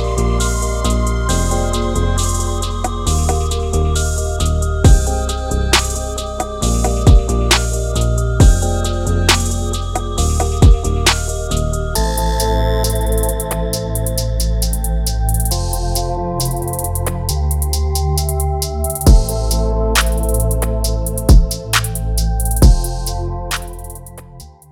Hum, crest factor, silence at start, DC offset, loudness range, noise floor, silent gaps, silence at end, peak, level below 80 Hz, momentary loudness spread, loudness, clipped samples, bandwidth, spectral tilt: none; 14 dB; 0 s; under 0.1%; 4 LU; -37 dBFS; none; 0.2 s; 0 dBFS; -16 dBFS; 8 LU; -17 LUFS; under 0.1%; 17.5 kHz; -4.5 dB/octave